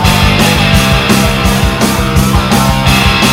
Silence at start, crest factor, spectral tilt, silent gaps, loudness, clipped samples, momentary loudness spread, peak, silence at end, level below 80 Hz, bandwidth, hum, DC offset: 0 s; 8 dB; -4.5 dB/octave; none; -9 LUFS; 0.6%; 3 LU; 0 dBFS; 0 s; -18 dBFS; 16.5 kHz; none; under 0.1%